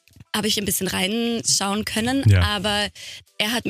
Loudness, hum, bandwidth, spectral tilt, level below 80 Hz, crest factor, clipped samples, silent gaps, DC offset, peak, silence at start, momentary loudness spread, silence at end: -21 LUFS; none; 15.5 kHz; -3.5 dB/octave; -42 dBFS; 16 dB; under 0.1%; none; under 0.1%; -6 dBFS; 0.35 s; 9 LU; 0 s